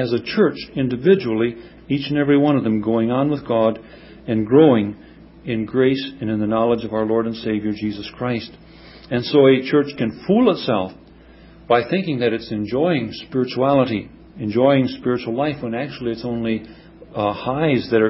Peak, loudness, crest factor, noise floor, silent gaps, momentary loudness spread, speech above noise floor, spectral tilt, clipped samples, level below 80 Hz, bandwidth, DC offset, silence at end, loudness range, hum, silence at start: -2 dBFS; -19 LUFS; 18 dB; -45 dBFS; none; 11 LU; 26 dB; -11 dB/octave; under 0.1%; -50 dBFS; 5.8 kHz; under 0.1%; 0 s; 3 LU; none; 0 s